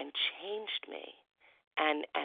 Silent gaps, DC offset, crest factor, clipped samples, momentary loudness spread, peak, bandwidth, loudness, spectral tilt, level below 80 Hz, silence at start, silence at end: 1.67-1.71 s; under 0.1%; 22 dB; under 0.1%; 15 LU; -16 dBFS; 4.8 kHz; -35 LUFS; -4.5 dB/octave; -90 dBFS; 0 s; 0 s